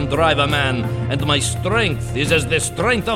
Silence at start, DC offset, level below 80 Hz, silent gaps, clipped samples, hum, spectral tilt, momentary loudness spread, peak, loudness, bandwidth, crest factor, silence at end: 0 s; 0.3%; -34 dBFS; none; under 0.1%; none; -4.5 dB/octave; 5 LU; -4 dBFS; -18 LUFS; 15.5 kHz; 14 dB; 0 s